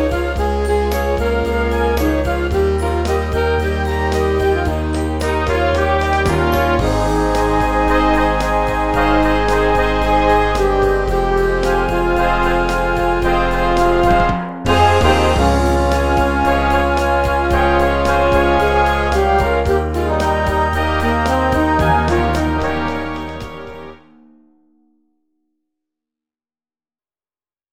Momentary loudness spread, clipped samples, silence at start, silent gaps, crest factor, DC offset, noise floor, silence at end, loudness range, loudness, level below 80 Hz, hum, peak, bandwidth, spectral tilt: 5 LU; under 0.1%; 0 s; none; 14 dB; 0.7%; under -90 dBFS; 0 s; 3 LU; -16 LUFS; -24 dBFS; none; 0 dBFS; 16 kHz; -6 dB/octave